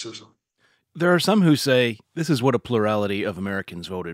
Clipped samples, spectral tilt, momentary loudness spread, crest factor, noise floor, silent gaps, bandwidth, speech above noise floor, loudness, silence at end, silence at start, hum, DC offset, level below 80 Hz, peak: under 0.1%; -5.5 dB/octave; 13 LU; 18 dB; -66 dBFS; none; 16 kHz; 44 dB; -22 LUFS; 0 s; 0 s; none; under 0.1%; -62 dBFS; -4 dBFS